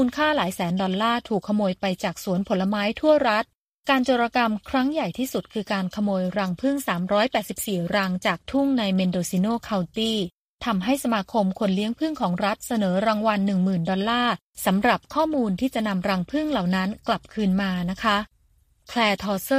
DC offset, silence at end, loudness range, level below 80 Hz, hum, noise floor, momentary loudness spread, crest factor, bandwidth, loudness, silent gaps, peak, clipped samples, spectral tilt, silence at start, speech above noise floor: under 0.1%; 0 s; 2 LU; -54 dBFS; none; -62 dBFS; 5 LU; 18 dB; 15.5 kHz; -24 LUFS; 3.55-3.83 s, 10.37-10.59 s, 14.42-14.53 s; -6 dBFS; under 0.1%; -5.5 dB/octave; 0 s; 39 dB